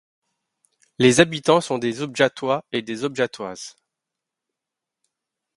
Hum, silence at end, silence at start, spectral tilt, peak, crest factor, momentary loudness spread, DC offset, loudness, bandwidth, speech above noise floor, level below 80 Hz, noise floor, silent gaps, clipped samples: none; 1.9 s; 1 s; -4.5 dB/octave; 0 dBFS; 24 dB; 16 LU; under 0.1%; -20 LUFS; 11.5 kHz; 65 dB; -64 dBFS; -86 dBFS; none; under 0.1%